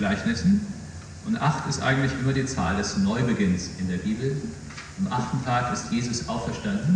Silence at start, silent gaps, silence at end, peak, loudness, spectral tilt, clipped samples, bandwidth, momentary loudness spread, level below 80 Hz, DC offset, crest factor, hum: 0 s; none; 0 s; -10 dBFS; -26 LUFS; -5.5 dB/octave; under 0.1%; 10 kHz; 11 LU; -46 dBFS; under 0.1%; 16 dB; none